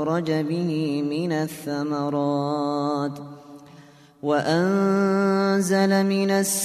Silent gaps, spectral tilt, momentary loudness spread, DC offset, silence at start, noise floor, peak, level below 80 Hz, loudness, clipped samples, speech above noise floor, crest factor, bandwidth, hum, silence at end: none; -5.5 dB/octave; 8 LU; under 0.1%; 0 s; -49 dBFS; -8 dBFS; -68 dBFS; -23 LUFS; under 0.1%; 27 dB; 16 dB; 14 kHz; none; 0 s